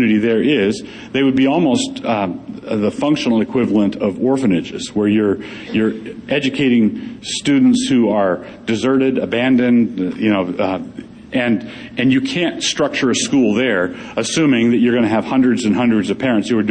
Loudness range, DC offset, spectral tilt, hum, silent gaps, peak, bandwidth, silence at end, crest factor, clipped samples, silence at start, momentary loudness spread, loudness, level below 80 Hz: 2 LU; under 0.1%; -5 dB/octave; none; none; -2 dBFS; 9.6 kHz; 0 s; 12 dB; under 0.1%; 0 s; 9 LU; -16 LUFS; -52 dBFS